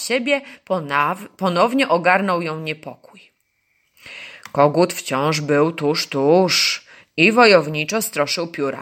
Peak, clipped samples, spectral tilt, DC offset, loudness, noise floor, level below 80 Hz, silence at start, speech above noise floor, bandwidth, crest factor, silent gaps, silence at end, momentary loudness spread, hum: 0 dBFS; under 0.1%; -4 dB/octave; under 0.1%; -18 LUFS; -67 dBFS; -68 dBFS; 0 s; 49 dB; 17 kHz; 18 dB; none; 0 s; 14 LU; none